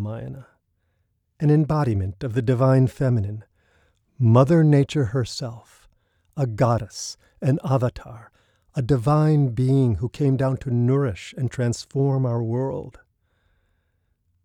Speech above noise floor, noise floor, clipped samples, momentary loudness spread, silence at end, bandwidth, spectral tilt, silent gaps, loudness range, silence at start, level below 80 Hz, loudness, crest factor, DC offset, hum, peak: 50 dB; -70 dBFS; under 0.1%; 15 LU; 1.5 s; 10.5 kHz; -8 dB/octave; none; 6 LU; 0 s; -50 dBFS; -22 LUFS; 18 dB; under 0.1%; none; -6 dBFS